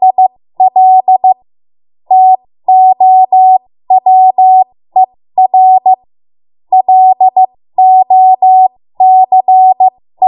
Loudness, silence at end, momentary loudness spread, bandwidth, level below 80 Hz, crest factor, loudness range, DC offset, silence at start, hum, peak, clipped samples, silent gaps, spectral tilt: -7 LUFS; 0 s; 6 LU; 1 kHz; -68 dBFS; 8 dB; 2 LU; under 0.1%; 0 s; none; 0 dBFS; under 0.1%; none; -9 dB/octave